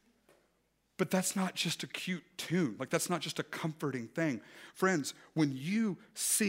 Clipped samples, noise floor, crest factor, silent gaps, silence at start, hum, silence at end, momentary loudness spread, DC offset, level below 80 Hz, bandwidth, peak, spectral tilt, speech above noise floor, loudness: under 0.1%; -76 dBFS; 22 dB; none; 1 s; none; 0 s; 7 LU; under 0.1%; -80 dBFS; 16 kHz; -14 dBFS; -4 dB/octave; 42 dB; -35 LUFS